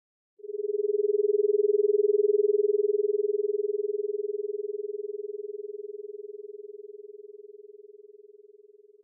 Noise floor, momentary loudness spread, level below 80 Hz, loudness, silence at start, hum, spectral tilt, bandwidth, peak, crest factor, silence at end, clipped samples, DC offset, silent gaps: -55 dBFS; 22 LU; under -90 dBFS; -27 LUFS; 0.45 s; none; -1.5 dB/octave; 0.6 kHz; -16 dBFS; 14 dB; 1.1 s; under 0.1%; under 0.1%; none